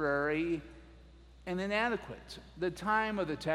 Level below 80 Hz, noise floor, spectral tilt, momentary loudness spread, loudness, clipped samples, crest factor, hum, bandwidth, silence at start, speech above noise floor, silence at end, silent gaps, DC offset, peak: -56 dBFS; -56 dBFS; -6 dB/octave; 16 LU; -34 LUFS; under 0.1%; 18 dB; none; 13.5 kHz; 0 s; 22 dB; 0 s; none; under 0.1%; -18 dBFS